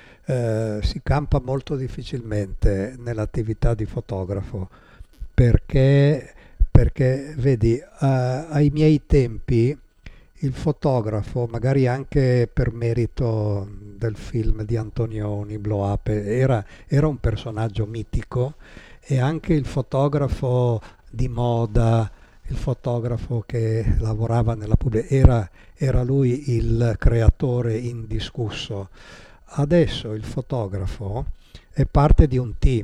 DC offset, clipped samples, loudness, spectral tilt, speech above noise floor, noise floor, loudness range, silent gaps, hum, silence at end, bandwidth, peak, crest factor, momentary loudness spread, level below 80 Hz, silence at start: under 0.1%; under 0.1%; -22 LUFS; -8.5 dB/octave; 24 dB; -44 dBFS; 5 LU; none; none; 0 s; 10 kHz; -2 dBFS; 20 dB; 11 LU; -28 dBFS; 0.3 s